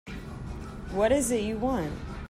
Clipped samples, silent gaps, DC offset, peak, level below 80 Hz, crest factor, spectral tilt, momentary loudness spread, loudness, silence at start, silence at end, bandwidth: under 0.1%; none; under 0.1%; -12 dBFS; -42 dBFS; 16 dB; -5 dB/octave; 15 LU; -28 LUFS; 0.05 s; 0 s; 16 kHz